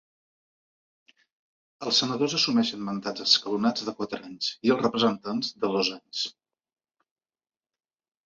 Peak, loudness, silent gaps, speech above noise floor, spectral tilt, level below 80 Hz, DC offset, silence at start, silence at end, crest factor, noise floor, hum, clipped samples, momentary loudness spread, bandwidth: -6 dBFS; -26 LUFS; none; over 63 dB; -3.5 dB/octave; -72 dBFS; under 0.1%; 1.8 s; 1.95 s; 24 dB; under -90 dBFS; none; under 0.1%; 10 LU; 7.8 kHz